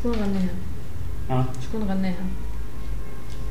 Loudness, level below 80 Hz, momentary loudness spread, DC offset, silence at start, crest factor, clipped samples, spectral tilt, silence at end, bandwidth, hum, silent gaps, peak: -29 LUFS; -34 dBFS; 10 LU; 7%; 0 s; 16 dB; under 0.1%; -7.5 dB/octave; 0 s; 16 kHz; none; none; -10 dBFS